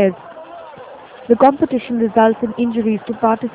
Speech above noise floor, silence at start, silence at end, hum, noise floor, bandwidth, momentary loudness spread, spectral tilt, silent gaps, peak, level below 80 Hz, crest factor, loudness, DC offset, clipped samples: 21 dB; 0 s; 0.05 s; none; -36 dBFS; 4 kHz; 23 LU; -11 dB/octave; none; 0 dBFS; -54 dBFS; 16 dB; -16 LUFS; under 0.1%; under 0.1%